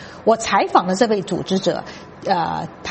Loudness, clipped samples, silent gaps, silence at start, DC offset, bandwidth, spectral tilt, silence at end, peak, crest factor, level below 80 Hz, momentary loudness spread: -19 LUFS; under 0.1%; none; 0 s; under 0.1%; 8.8 kHz; -4.5 dB/octave; 0 s; 0 dBFS; 18 dB; -54 dBFS; 11 LU